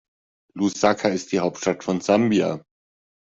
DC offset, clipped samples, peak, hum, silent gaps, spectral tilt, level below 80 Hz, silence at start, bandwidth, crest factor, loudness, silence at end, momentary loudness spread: under 0.1%; under 0.1%; -4 dBFS; none; none; -5 dB/octave; -62 dBFS; 0.55 s; 8 kHz; 20 dB; -22 LUFS; 0.8 s; 8 LU